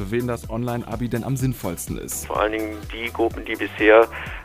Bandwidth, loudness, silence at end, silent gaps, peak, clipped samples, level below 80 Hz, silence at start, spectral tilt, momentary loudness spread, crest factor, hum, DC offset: 16 kHz; -22 LUFS; 0 s; none; -2 dBFS; under 0.1%; -40 dBFS; 0 s; -5.5 dB/octave; 14 LU; 20 dB; none; under 0.1%